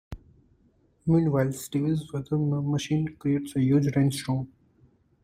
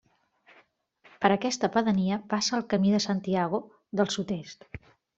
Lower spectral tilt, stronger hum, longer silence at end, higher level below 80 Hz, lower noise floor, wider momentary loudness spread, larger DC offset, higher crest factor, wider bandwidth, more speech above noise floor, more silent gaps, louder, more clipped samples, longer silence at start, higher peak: first, -7 dB/octave vs -5 dB/octave; neither; first, 0.8 s vs 0.4 s; first, -54 dBFS vs -64 dBFS; about the same, -64 dBFS vs -63 dBFS; second, 9 LU vs 13 LU; neither; second, 16 dB vs 24 dB; first, 16 kHz vs 8 kHz; about the same, 39 dB vs 36 dB; neither; about the same, -26 LUFS vs -27 LUFS; neither; second, 0.1 s vs 1.2 s; second, -10 dBFS vs -6 dBFS